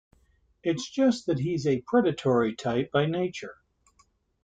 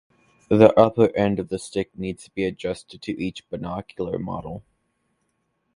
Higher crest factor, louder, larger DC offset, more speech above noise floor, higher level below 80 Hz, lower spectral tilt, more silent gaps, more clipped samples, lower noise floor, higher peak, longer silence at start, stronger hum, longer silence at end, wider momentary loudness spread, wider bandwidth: second, 18 dB vs 24 dB; second, -27 LUFS vs -23 LUFS; neither; second, 40 dB vs 50 dB; second, -64 dBFS vs -52 dBFS; about the same, -6.5 dB/octave vs -7 dB/octave; neither; neither; second, -66 dBFS vs -72 dBFS; second, -10 dBFS vs 0 dBFS; first, 0.65 s vs 0.5 s; neither; second, 0.9 s vs 1.15 s; second, 8 LU vs 17 LU; second, 9.2 kHz vs 11.5 kHz